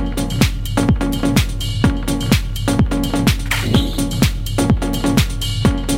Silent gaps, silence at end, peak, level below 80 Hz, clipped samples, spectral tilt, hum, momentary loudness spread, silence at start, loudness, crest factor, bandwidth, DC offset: none; 0 s; 0 dBFS; -22 dBFS; under 0.1%; -5 dB/octave; none; 3 LU; 0 s; -18 LUFS; 16 dB; 16.5 kHz; under 0.1%